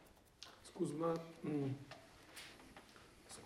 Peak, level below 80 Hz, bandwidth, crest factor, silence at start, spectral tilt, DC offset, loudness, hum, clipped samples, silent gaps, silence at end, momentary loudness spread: -28 dBFS; -74 dBFS; 16 kHz; 18 dB; 0 s; -6 dB/octave; under 0.1%; -45 LUFS; none; under 0.1%; none; 0 s; 19 LU